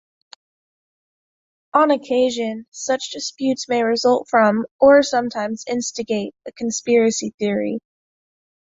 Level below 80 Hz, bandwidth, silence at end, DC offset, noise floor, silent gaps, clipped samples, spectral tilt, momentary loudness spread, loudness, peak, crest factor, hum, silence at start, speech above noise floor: -62 dBFS; 8 kHz; 0.85 s; under 0.1%; under -90 dBFS; 2.68-2.72 s, 4.71-4.79 s, 7.34-7.38 s; under 0.1%; -3.5 dB/octave; 11 LU; -19 LUFS; -2 dBFS; 18 dB; none; 1.75 s; over 71 dB